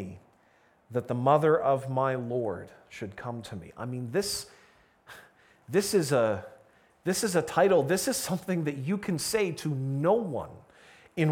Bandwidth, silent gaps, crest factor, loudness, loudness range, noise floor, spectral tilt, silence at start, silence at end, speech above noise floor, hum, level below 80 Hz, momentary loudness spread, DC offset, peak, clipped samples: 19 kHz; none; 20 dB; -28 LUFS; 7 LU; -64 dBFS; -5 dB/octave; 0 s; 0 s; 36 dB; none; -64 dBFS; 16 LU; under 0.1%; -10 dBFS; under 0.1%